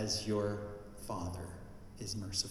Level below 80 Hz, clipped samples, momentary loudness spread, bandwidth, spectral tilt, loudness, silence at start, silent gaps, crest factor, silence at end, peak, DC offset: -56 dBFS; under 0.1%; 14 LU; 15 kHz; -4 dB/octave; -40 LUFS; 0 s; none; 20 dB; 0 s; -18 dBFS; under 0.1%